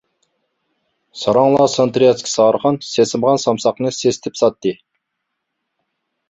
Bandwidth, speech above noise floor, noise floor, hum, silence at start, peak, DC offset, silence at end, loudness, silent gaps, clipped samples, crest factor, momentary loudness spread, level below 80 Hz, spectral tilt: 8.2 kHz; 61 dB; -76 dBFS; none; 1.15 s; -2 dBFS; under 0.1%; 1.55 s; -16 LUFS; none; under 0.1%; 16 dB; 7 LU; -58 dBFS; -5 dB/octave